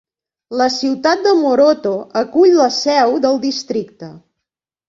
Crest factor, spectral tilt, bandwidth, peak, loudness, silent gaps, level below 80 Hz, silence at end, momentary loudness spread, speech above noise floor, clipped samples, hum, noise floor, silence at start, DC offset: 14 dB; -4 dB/octave; 7.6 kHz; -2 dBFS; -14 LUFS; none; -62 dBFS; 0.7 s; 11 LU; 67 dB; under 0.1%; none; -81 dBFS; 0.5 s; under 0.1%